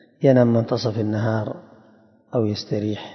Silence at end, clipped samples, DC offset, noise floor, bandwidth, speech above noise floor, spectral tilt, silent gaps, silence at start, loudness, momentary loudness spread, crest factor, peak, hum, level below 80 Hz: 0 s; under 0.1%; under 0.1%; -54 dBFS; 6.4 kHz; 34 dB; -8 dB/octave; none; 0.2 s; -21 LUFS; 11 LU; 20 dB; -2 dBFS; none; -64 dBFS